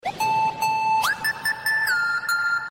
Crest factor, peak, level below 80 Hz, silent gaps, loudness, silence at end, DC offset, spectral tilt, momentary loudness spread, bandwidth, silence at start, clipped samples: 12 dB; -12 dBFS; -60 dBFS; none; -22 LUFS; 0 s; under 0.1%; -1 dB/octave; 3 LU; 16.5 kHz; 0.05 s; under 0.1%